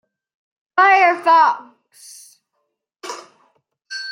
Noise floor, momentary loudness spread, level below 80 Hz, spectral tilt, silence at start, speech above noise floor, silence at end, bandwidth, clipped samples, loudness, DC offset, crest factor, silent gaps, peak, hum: -74 dBFS; 21 LU; -88 dBFS; -1 dB/octave; 0.75 s; 59 dB; 0 s; 15.5 kHz; under 0.1%; -14 LUFS; under 0.1%; 16 dB; none; -2 dBFS; none